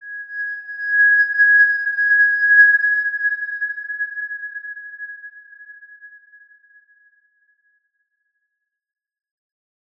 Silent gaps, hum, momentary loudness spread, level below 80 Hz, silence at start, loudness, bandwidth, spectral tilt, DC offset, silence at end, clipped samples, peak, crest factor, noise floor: none; none; 21 LU; -88 dBFS; 0 s; -15 LUFS; 5.2 kHz; 2 dB/octave; under 0.1%; 3.9 s; under 0.1%; -2 dBFS; 18 dB; -78 dBFS